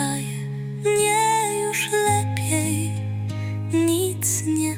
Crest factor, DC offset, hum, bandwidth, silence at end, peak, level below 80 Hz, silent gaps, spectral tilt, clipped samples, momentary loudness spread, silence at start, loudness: 14 dB; under 0.1%; none; 17 kHz; 0 s; -8 dBFS; -58 dBFS; none; -4.5 dB/octave; under 0.1%; 9 LU; 0 s; -22 LUFS